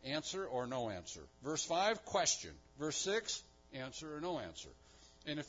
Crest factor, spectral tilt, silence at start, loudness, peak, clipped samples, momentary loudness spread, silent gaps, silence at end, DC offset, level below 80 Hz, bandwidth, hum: 20 dB; -2.5 dB/octave; 0 s; -39 LUFS; -22 dBFS; under 0.1%; 16 LU; none; 0 s; under 0.1%; -68 dBFS; 7.4 kHz; none